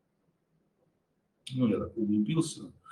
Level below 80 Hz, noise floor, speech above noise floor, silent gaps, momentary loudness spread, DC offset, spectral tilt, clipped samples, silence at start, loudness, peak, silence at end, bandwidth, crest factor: -70 dBFS; -76 dBFS; 46 dB; none; 14 LU; under 0.1%; -6.5 dB/octave; under 0.1%; 1.45 s; -31 LUFS; -16 dBFS; 0 s; 12.5 kHz; 18 dB